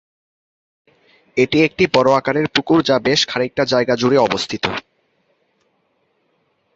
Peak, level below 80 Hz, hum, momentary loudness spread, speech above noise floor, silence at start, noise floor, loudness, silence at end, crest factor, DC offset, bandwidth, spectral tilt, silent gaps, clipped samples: 0 dBFS; -52 dBFS; none; 7 LU; 49 dB; 1.35 s; -65 dBFS; -16 LUFS; 1.95 s; 18 dB; under 0.1%; 8 kHz; -4.5 dB/octave; none; under 0.1%